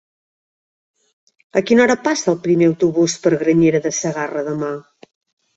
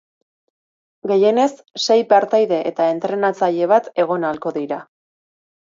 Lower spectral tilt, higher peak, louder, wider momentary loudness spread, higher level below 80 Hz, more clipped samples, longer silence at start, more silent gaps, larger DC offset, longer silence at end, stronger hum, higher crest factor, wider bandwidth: about the same, -5 dB/octave vs -5 dB/octave; about the same, -2 dBFS vs 0 dBFS; about the same, -17 LUFS vs -18 LUFS; about the same, 9 LU vs 10 LU; first, -58 dBFS vs -72 dBFS; neither; first, 1.55 s vs 1.05 s; neither; neither; about the same, 0.75 s vs 0.85 s; neither; about the same, 16 dB vs 18 dB; about the same, 8 kHz vs 7.6 kHz